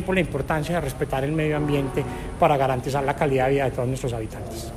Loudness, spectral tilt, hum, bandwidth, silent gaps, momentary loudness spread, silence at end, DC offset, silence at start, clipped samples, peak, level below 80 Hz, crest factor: -24 LUFS; -6.5 dB/octave; none; 15.5 kHz; none; 8 LU; 0 s; under 0.1%; 0 s; under 0.1%; -4 dBFS; -38 dBFS; 20 dB